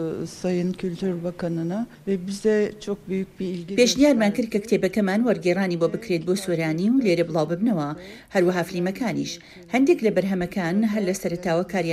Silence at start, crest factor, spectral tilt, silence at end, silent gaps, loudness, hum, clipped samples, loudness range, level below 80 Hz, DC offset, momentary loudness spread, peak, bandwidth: 0 s; 16 dB; -5.5 dB/octave; 0 s; none; -23 LUFS; none; under 0.1%; 3 LU; -56 dBFS; under 0.1%; 9 LU; -6 dBFS; 15 kHz